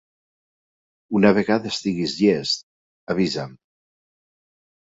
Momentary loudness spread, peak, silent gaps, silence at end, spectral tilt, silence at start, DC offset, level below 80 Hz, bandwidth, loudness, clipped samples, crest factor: 10 LU; -2 dBFS; 2.63-3.07 s; 1.3 s; -5.5 dB/octave; 1.1 s; under 0.1%; -60 dBFS; 8 kHz; -21 LUFS; under 0.1%; 22 dB